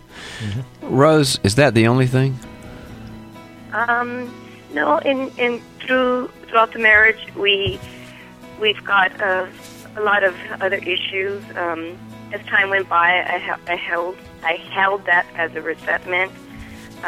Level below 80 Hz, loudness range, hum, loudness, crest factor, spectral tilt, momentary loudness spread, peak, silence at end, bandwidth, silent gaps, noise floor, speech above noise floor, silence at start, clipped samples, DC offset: -50 dBFS; 5 LU; none; -18 LUFS; 20 dB; -5 dB/octave; 22 LU; 0 dBFS; 0 s; 16 kHz; none; -39 dBFS; 21 dB; 0.1 s; under 0.1%; under 0.1%